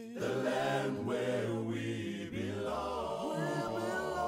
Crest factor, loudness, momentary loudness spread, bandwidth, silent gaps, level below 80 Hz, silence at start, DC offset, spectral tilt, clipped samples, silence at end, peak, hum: 14 dB; -36 LUFS; 5 LU; 16 kHz; none; -62 dBFS; 0 s; under 0.1%; -5.5 dB/octave; under 0.1%; 0 s; -22 dBFS; none